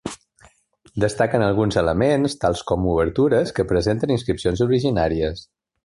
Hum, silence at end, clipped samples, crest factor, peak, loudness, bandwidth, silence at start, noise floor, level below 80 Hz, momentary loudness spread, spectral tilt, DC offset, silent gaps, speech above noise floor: none; 0.45 s; under 0.1%; 16 dB; -4 dBFS; -20 LUFS; 11.5 kHz; 0.05 s; -56 dBFS; -38 dBFS; 6 LU; -6.5 dB/octave; under 0.1%; none; 36 dB